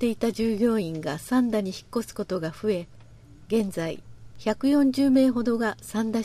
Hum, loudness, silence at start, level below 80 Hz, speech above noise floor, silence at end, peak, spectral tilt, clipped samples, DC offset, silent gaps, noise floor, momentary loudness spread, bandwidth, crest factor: none; -25 LUFS; 0 s; -54 dBFS; 24 dB; 0 s; -10 dBFS; -6 dB/octave; under 0.1%; under 0.1%; none; -48 dBFS; 11 LU; 14.5 kHz; 16 dB